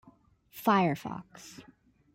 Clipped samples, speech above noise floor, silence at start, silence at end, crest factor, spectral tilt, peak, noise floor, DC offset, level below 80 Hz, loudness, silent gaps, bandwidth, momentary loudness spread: under 0.1%; 32 dB; 0.55 s; 0.55 s; 20 dB; -6 dB/octave; -14 dBFS; -61 dBFS; under 0.1%; -70 dBFS; -29 LUFS; none; 16.5 kHz; 24 LU